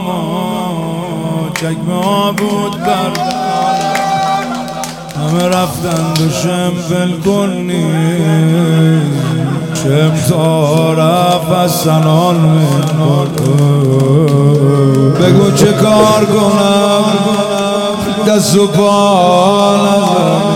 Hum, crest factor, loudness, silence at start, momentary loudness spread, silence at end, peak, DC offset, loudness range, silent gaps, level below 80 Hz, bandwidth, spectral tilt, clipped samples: none; 10 dB; -11 LUFS; 0 s; 8 LU; 0 s; 0 dBFS; under 0.1%; 5 LU; none; -44 dBFS; 17 kHz; -6 dB/octave; under 0.1%